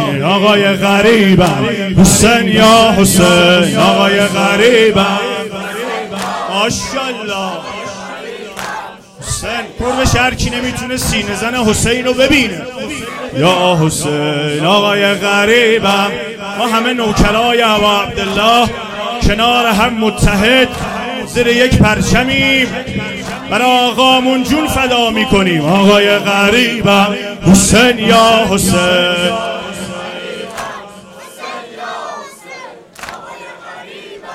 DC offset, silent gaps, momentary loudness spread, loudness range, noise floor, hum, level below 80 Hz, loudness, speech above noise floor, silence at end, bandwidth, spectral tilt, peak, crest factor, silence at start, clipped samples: under 0.1%; none; 17 LU; 11 LU; -33 dBFS; none; -30 dBFS; -11 LUFS; 23 dB; 0 s; 16.5 kHz; -4 dB/octave; 0 dBFS; 12 dB; 0 s; under 0.1%